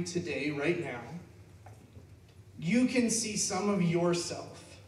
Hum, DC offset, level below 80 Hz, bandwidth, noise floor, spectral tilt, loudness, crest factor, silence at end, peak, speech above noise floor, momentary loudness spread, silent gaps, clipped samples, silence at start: none; under 0.1%; -66 dBFS; 13.5 kHz; -54 dBFS; -4.5 dB/octave; -31 LUFS; 16 dB; 0 s; -16 dBFS; 23 dB; 15 LU; none; under 0.1%; 0 s